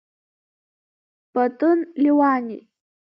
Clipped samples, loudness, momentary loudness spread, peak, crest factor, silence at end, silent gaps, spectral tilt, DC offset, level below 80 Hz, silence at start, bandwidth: under 0.1%; -20 LUFS; 14 LU; -6 dBFS; 16 dB; 0.45 s; none; -9 dB/octave; under 0.1%; -80 dBFS; 1.35 s; 5.6 kHz